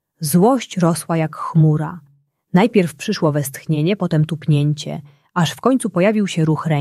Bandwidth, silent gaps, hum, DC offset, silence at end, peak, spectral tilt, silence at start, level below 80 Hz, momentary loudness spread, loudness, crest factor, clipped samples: 14 kHz; none; none; under 0.1%; 0 s; -2 dBFS; -6.5 dB/octave; 0.2 s; -58 dBFS; 8 LU; -18 LUFS; 16 dB; under 0.1%